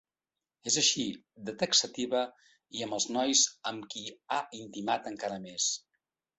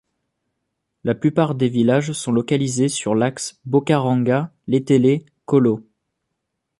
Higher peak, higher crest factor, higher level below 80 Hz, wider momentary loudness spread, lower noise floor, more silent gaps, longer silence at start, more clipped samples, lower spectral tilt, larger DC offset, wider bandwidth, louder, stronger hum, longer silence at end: second, -12 dBFS vs -2 dBFS; first, 22 dB vs 16 dB; second, -74 dBFS vs -60 dBFS; first, 15 LU vs 6 LU; first, under -90 dBFS vs -77 dBFS; neither; second, 0.65 s vs 1.05 s; neither; second, -1 dB/octave vs -6 dB/octave; neither; second, 8.4 kHz vs 11.5 kHz; second, -30 LUFS vs -19 LUFS; neither; second, 0.6 s vs 1 s